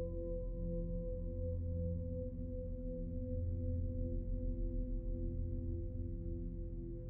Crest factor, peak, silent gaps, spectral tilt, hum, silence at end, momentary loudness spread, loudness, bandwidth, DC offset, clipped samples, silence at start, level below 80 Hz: 10 dB; -30 dBFS; none; -15.5 dB/octave; none; 0 s; 4 LU; -43 LUFS; 1.1 kHz; under 0.1%; under 0.1%; 0 s; -42 dBFS